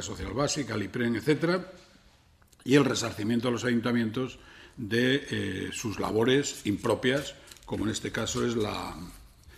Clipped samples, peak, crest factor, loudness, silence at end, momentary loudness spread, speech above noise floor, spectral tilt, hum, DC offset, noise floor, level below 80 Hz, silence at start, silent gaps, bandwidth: under 0.1%; -8 dBFS; 20 dB; -29 LUFS; 0 s; 15 LU; 32 dB; -4.5 dB/octave; none; under 0.1%; -60 dBFS; -54 dBFS; 0 s; none; 14.5 kHz